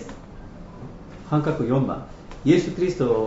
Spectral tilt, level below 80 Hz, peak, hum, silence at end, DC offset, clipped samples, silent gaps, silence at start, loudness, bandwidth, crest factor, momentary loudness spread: -7.5 dB/octave; -44 dBFS; -4 dBFS; none; 0 s; under 0.1%; under 0.1%; none; 0 s; -23 LUFS; 8 kHz; 20 dB; 22 LU